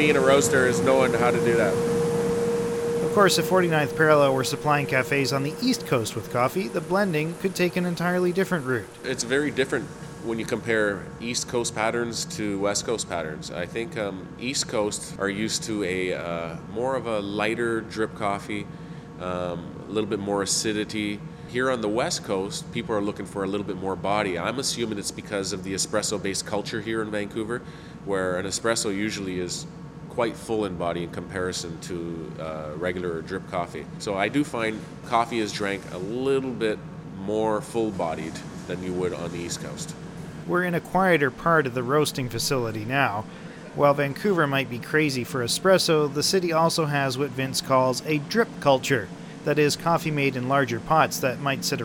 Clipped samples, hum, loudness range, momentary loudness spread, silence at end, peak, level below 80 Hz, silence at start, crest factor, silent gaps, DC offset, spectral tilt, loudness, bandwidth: under 0.1%; none; 7 LU; 11 LU; 0 s; -4 dBFS; -54 dBFS; 0 s; 20 dB; none; under 0.1%; -4.5 dB/octave; -25 LUFS; 17.5 kHz